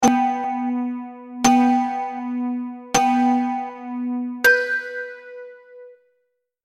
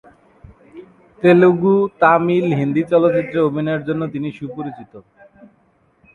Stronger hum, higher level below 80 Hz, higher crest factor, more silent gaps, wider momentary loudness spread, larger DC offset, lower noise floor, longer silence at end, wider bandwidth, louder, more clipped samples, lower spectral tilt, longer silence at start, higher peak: neither; about the same, -58 dBFS vs -56 dBFS; about the same, 18 dB vs 18 dB; neither; about the same, 17 LU vs 16 LU; neither; first, -72 dBFS vs -58 dBFS; second, 0.7 s vs 1.15 s; first, 14.5 kHz vs 6.6 kHz; second, -21 LUFS vs -16 LUFS; neither; second, -3 dB/octave vs -9 dB/octave; second, 0 s vs 0.75 s; about the same, -2 dBFS vs 0 dBFS